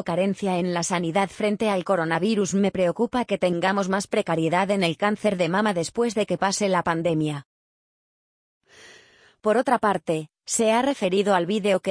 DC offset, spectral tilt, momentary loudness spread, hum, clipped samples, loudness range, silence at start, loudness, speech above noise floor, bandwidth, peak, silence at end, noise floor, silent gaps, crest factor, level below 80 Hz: under 0.1%; -5 dB/octave; 4 LU; none; under 0.1%; 4 LU; 0 s; -23 LUFS; 32 dB; 10.5 kHz; -6 dBFS; 0 s; -54 dBFS; 7.45-8.61 s; 16 dB; -62 dBFS